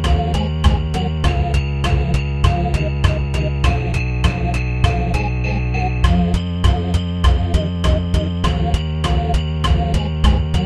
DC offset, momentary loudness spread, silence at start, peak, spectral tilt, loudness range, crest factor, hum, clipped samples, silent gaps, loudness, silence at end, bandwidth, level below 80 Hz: under 0.1%; 3 LU; 0 s; 0 dBFS; -6.5 dB/octave; 1 LU; 16 dB; none; under 0.1%; none; -18 LUFS; 0 s; 11 kHz; -20 dBFS